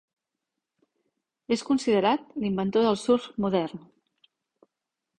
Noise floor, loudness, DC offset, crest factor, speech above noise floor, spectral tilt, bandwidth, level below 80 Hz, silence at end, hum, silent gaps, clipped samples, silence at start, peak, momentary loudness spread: -85 dBFS; -26 LUFS; under 0.1%; 18 dB; 60 dB; -6 dB/octave; 10.5 kHz; -64 dBFS; 1.4 s; none; none; under 0.1%; 1.5 s; -10 dBFS; 7 LU